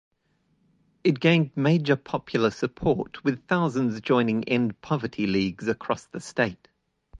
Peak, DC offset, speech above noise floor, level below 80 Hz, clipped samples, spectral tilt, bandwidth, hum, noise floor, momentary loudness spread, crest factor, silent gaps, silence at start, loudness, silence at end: -6 dBFS; under 0.1%; 45 dB; -56 dBFS; under 0.1%; -7 dB/octave; 9.8 kHz; none; -70 dBFS; 7 LU; 20 dB; none; 1.05 s; -25 LUFS; 0 s